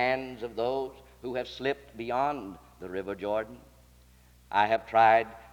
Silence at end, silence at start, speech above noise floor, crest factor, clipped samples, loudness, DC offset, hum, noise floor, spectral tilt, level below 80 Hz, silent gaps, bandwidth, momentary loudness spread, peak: 0.05 s; 0 s; 29 dB; 20 dB; under 0.1%; -29 LUFS; under 0.1%; none; -58 dBFS; -5.5 dB/octave; -58 dBFS; none; 19.5 kHz; 17 LU; -10 dBFS